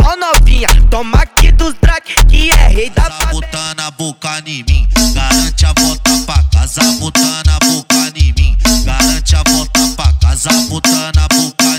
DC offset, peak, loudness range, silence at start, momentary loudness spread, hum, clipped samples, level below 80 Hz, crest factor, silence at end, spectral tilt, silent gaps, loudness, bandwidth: under 0.1%; 0 dBFS; 2 LU; 0 s; 7 LU; none; under 0.1%; -12 dBFS; 10 dB; 0 s; -3.5 dB/octave; none; -11 LUFS; over 20 kHz